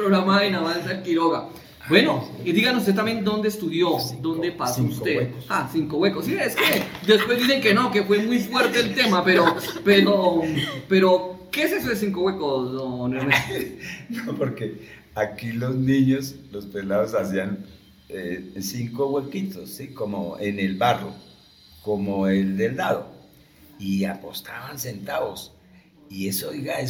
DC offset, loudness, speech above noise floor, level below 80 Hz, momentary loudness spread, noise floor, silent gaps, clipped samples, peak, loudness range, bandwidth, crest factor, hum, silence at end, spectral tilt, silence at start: under 0.1%; -22 LUFS; 30 dB; -56 dBFS; 14 LU; -52 dBFS; none; under 0.1%; 0 dBFS; 9 LU; 18 kHz; 22 dB; none; 0 s; -5 dB/octave; 0 s